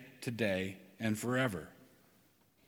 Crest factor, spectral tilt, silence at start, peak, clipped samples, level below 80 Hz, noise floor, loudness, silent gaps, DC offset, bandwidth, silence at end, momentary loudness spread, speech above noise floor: 20 dB; -5.5 dB/octave; 0 s; -20 dBFS; under 0.1%; -72 dBFS; -69 dBFS; -36 LUFS; none; under 0.1%; 19.5 kHz; 0.85 s; 11 LU; 34 dB